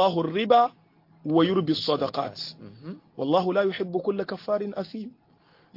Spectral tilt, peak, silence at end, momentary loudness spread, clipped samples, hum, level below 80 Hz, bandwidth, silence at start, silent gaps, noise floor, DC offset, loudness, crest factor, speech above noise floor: -7 dB/octave; -8 dBFS; 0.65 s; 18 LU; under 0.1%; none; -70 dBFS; 5.8 kHz; 0 s; none; -60 dBFS; under 0.1%; -25 LUFS; 18 dB; 35 dB